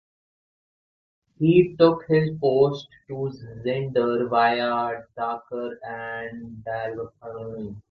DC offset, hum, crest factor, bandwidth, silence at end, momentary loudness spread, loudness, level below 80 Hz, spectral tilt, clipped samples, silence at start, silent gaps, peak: under 0.1%; none; 20 dB; 6.2 kHz; 0.1 s; 17 LU; -24 LUFS; -60 dBFS; -8.5 dB/octave; under 0.1%; 1.4 s; none; -4 dBFS